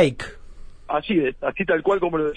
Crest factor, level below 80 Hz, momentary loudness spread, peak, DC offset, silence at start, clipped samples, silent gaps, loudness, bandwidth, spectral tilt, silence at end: 18 dB; -44 dBFS; 10 LU; -4 dBFS; under 0.1%; 0 s; under 0.1%; none; -22 LUFS; 10.5 kHz; -6.5 dB/octave; 0 s